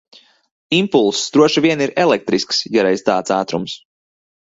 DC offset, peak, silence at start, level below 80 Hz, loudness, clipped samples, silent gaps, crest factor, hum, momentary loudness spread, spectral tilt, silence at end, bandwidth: under 0.1%; 0 dBFS; 0.7 s; -58 dBFS; -16 LUFS; under 0.1%; none; 16 dB; none; 8 LU; -4 dB/octave; 0.65 s; 8 kHz